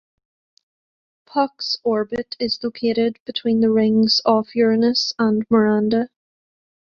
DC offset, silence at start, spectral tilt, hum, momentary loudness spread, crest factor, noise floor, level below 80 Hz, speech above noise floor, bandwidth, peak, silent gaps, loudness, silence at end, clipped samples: under 0.1%; 1.35 s; -5.5 dB/octave; none; 8 LU; 18 dB; under -90 dBFS; -62 dBFS; over 71 dB; 7 kHz; -2 dBFS; 3.20-3.26 s; -19 LUFS; 0.75 s; under 0.1%